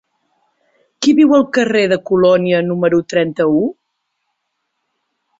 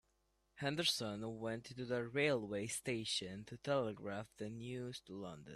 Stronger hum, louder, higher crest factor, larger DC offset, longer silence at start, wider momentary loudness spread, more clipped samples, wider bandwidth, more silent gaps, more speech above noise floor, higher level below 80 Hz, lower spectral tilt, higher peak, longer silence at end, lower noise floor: neither; first, -14 LUFS vs -41 LUFS; second, 14 dB vs 20 dB; neither; first, 1 s vs 0.55 s; second, 7 LU vs 12 LU; neither; second, 7.8 kHz vs 14 kHz; neither; first, 59 dB vs 38 dB; first, -58 dBFS vs -74 dBFS; first, -6 dB/octave vs -4 dB/octave; first, -2 dBFS vs -22 dBFS; first, 1.65 s vs 0 s; second, -72 dBFS vs -80 dBFS